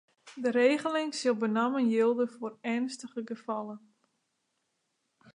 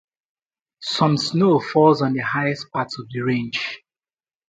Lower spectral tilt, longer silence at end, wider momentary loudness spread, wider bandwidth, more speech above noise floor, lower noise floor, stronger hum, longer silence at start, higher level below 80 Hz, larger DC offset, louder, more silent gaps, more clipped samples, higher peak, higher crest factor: second, -4.5 dB/octave vs -6 dB/octave; first, 1.55 s vs 0.7 s; about the same, 13 LU vs 12 LU; first, 11 kHz vs 9.2 kHz; second, 50 dB vs over 70 dB; second, -79 dBFS vs under -90 dBFS; neither; second, 0.25 s vs 0.8 s; second, -86 dBFS vs -64 dBFS; neither; second, -30 LUFS vs -20 LUFS; neither; neither; second, -12 dBFS vs -2 dBFS; about the same, 20 dB vs 20 dB